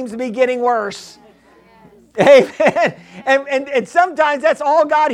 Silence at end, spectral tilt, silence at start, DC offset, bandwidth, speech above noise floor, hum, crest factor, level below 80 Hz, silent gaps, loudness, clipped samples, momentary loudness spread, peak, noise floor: 0 s; -4.5 dB/octave; 0 s; under 0.1%; 11 kHz; 34 dB; none; 16 dB; -60 dBFS; none; -15 LUFS; under 0.1%; 14 LU; 0 dBFS; -48 dBFS